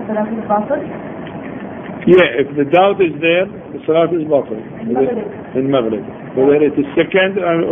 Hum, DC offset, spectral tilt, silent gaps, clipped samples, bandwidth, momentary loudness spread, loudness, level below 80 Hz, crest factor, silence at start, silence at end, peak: none; under 0.1%; -9 dB/octave; none; under 0.1%; 3.7 kHz; 16 LU; -15 LUFS; -50 dBFS; 16 dB; 0 s; 0 s; 0 dBFS